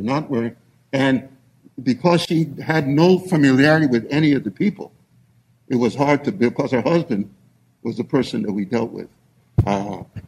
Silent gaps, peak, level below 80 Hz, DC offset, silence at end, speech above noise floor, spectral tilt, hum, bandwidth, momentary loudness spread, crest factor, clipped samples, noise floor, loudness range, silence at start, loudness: none; -2 dBFS; -48 dBFS; under 0.1%; 0.1 s; 38 dB; -7 dB/octave; none; 14 kHz; 14 LU; 18 dB; under 0.1%; -57 dBFS; 6 LU; 0 s; -19 LUFS